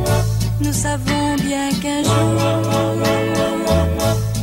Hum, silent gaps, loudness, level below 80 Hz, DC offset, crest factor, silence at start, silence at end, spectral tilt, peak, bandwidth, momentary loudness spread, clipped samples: none; none; -18 LUFS; -30 dBFS; under 0.1%; 12 dB; 0 s; 0 s; -5.5 dB/octave; -4 dBFS; 16.5 kHz; 3 LU; under 0.1%